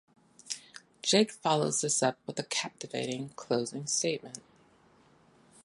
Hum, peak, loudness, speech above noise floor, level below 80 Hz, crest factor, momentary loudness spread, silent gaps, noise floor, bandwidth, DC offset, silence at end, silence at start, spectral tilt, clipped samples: none; -10 dBFS; -31 LUFS; 32 dB; -78 dBFS; 22 dB; 14 LU; none; -63 dBFS; 11.5 kHz; under 0.1%; 1.25 s; 0.45 s; -3 dB/octave; under 0.1%